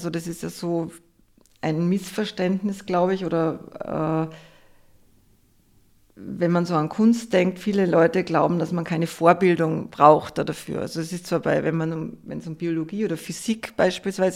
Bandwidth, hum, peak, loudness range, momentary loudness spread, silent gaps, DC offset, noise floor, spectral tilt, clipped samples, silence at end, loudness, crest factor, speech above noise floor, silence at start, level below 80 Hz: 15.5 kHz; none; 0 dBFS; 7 LU; 12 LU; none; under 0.1%; -59 dBFS; -6.5 dB/octave; under 0.1%; 0 s; -23 LUFS; 24 dB; 36 dB; 0 s; -60 dBFS